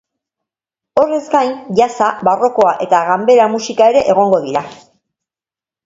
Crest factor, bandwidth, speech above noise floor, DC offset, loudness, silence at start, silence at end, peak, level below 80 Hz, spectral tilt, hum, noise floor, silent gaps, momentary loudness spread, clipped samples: 14 dB; 7.8 kHz; over 78 dB; under 0.1%; -13 LUFS; 0.95 s; 1.1 s; 0 dBFS; -56 dBFS; -5 dB/octave; none; under -90 dBFS; none; 5 LU; under 0.1%